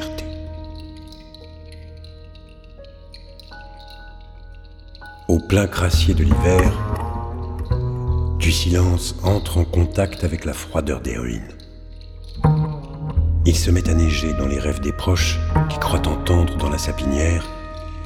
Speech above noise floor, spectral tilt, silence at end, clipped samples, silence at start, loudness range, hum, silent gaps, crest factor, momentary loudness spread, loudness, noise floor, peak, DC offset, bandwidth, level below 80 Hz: 22 dB; -5.5 dB/octave; 0 s; under 0.1%; 0 s; 20 LU; none; none; 20 dB; 23 LU; -20 LUFS; -41 dBFS; 0 dBFS; under 0.1%; 15 kHz; -26 dBFS